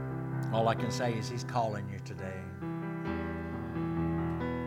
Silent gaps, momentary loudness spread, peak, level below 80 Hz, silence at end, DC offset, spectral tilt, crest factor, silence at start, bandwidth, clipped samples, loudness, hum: none; 10 LU; -14 dBFS; -56 dBFS; 0 s; under 0.1%; -6.5 dB/octave; 18 dB; 0 s; 15 kHz; under 0.1%; -34 LUFS; none